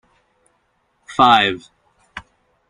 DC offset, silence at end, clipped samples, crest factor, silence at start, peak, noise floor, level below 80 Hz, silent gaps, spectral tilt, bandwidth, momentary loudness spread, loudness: under 0.1%; 0.5 s; under 0.1%; 20 dB; 1.1 s; -2 dBFS; -65 dBFS; -54 dBFS; none; -4 dB/octave; 11 kHz; 25 LU; -15 LUFS